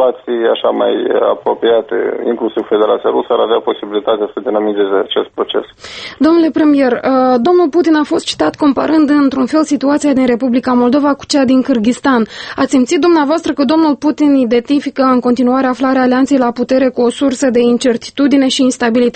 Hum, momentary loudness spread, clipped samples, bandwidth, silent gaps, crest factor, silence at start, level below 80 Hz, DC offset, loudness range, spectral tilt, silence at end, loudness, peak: none; 6 LU; under 0.1%; 8.8 kHz; none; 12 dB; 0 s; -50 dBFS; under 0.1%; 3 LU; -4.5 dB/octave; 0.05 s; -12 LUFS; 0 dBFS